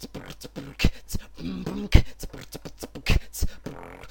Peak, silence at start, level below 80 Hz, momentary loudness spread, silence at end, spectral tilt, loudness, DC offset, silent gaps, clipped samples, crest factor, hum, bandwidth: 0 dBFS; 0 s; -28 dBFS; 17 LU; 0 s; -5 dB/octave; -28 LUFS; under 0.1%; none; under 0.1%; 26 dB; none; 17 kHz